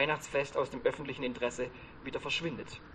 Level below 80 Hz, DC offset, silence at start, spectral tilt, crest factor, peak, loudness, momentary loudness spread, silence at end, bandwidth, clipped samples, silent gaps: -58 dBFS; under 0.1%; 0 s; -4 dB/octave; 20 dB; -16 dBFS; -35 LUFS; 9 LU; 0 s; 10 kHz; under 0.1%; none